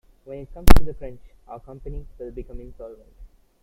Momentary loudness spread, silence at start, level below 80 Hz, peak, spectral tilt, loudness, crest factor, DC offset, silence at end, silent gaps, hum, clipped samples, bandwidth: 22 LU; 0.65 s; -26 dBFS; 0 dBFS; -6 dB/octave; -26 LUFS; 18 dB; under 0.1%; 1.2 s; none; none; 0.2%; 16 kHz